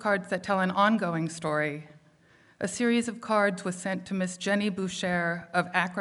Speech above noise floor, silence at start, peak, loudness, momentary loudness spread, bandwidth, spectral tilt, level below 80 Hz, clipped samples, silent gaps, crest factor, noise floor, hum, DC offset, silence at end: 32 dB; 0 s; -10 dBFS; -28 LUFS; 8 LU; 11.5 kHz; -5 dB/octave; -70 dBFS; under 0.1%; none; 20 dB; -60 dBFS; none; under 0.1%; 0 s